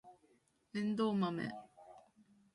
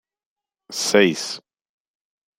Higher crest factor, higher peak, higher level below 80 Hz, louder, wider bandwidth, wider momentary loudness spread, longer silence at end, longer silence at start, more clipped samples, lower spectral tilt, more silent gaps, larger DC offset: about the same, 18 dB vs 22 dB; second, -24 dBFS vs -2 dBFS; second, -80 dBFS vs -66 dBFS; second, -38 LUFS vs -19 LUFS; second, 11 kHz vs 16 kHz; first, 24 LU vs 15 LU; second, 0.55 s vs 1 s; second, 0.05 s vs 0.7 s; neither; first, -7.5 dB/octave vs -3 dB/octave; neither; neither